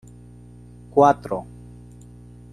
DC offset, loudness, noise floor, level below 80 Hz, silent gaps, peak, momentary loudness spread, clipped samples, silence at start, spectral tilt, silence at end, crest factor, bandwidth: under 0.1%; -20 LUFS; -44 dBFS; -50 dBFS; none; -2 dBFS; 27 LU; under 0.1%; 0.95 s; -7 dB/octave; 1.1 s; 22 dB; 12 kHz